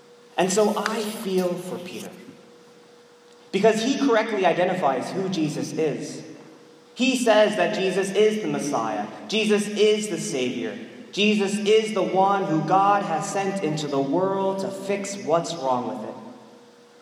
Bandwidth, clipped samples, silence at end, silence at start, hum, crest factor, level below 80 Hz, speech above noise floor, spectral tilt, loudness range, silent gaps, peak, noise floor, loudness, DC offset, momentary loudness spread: 16 kHz; under 0.1%; 0.45 s; 0.35 s; none; 20 dB; -78 dBFS; 28 dB; -4.5 dB/octave; 4 LU; none; -4 dBFS; -51 dBFS; -23 LUFS; under 0.1%; 13 LU